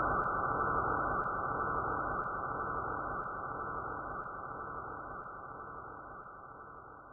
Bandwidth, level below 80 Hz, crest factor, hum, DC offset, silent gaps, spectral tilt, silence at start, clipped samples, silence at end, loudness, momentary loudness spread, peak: 1.9 kHz; -54 dBFS; 16 dB; none; under 0.1%; none; 1.5 dB/octave; 0 s; under 0.1%; 0 s; -37 LUFS; 16 LU; -20 dBFS